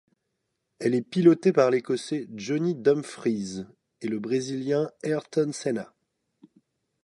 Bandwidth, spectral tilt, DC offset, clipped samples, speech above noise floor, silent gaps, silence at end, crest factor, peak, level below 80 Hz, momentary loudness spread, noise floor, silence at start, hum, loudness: 11.5 kHz; -6.5 dB/octave; under 0.1%; under 0.1%; 54 dB; none; 1.2 s; 20 dB; -6 dBFS; -72 dBFS; 13 LU; -79 dBFS; 0.8 s; none; -26 LUFS